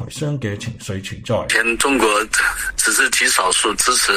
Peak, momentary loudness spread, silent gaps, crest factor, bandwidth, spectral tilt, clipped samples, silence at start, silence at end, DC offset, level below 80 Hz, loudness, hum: 0 dBFS; 13 LU; none; 18 dB; 15.5 kHz; -2 dB/octave; under 0.1%; 0 s; 0 s; under 0.1%; -42 dBFS; -16 LUFS; none